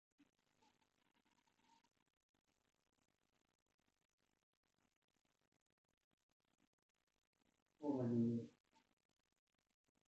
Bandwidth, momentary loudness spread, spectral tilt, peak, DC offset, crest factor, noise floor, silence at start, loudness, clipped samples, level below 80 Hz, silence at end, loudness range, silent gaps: 7.6 kHz; 11 LU; -9.5 dB/octave; -32 dBFS; under 0.1%; 22 dB; -82 dBFS; 7.8 s; -44 LUFS; under 0.1%; under -90 dBFS; 1.6 s; 4 LU; none